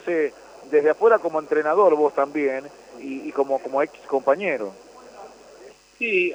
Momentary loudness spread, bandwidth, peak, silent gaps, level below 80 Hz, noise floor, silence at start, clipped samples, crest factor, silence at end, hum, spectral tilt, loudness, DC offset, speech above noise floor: 15 LU; 9 kHz; -6 dBFS; none; -70 dBFS; -47 dBFS; 0.05 s; under 0.1%; 18 dB; 0 s; none; -5.5 dB/octave; -22 LUFS; under 0.1%; 26 dB